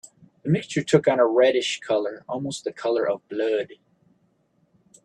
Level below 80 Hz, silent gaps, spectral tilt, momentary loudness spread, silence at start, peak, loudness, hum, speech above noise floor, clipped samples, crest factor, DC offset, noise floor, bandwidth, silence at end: -68 dBFS; none; -5.5 dB/octave; 12 LU; 0.45 s; -4 dBFS; -23 LUFS; none; 43 dB; under 0.1%; 20 dB; under 0.1%; -66 dBFS; 11 kHz; 1.3 s